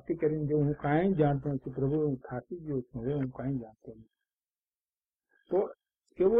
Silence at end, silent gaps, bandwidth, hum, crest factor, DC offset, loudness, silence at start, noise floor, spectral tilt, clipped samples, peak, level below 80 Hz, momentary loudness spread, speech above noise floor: 0 s; 4.33-4.37 s, 4.67-4.71 s, 4.89-4.93 s, 5.15-5.19 s; 3.9 kHz; none; 18 dB; under 0.1%; -32 LUFS; 0.05 s; under -90 dBFS; -11.5 dB/octave; under 0.1%; -14 dBFS; -58 dBFS; 11 LU; over 59 dB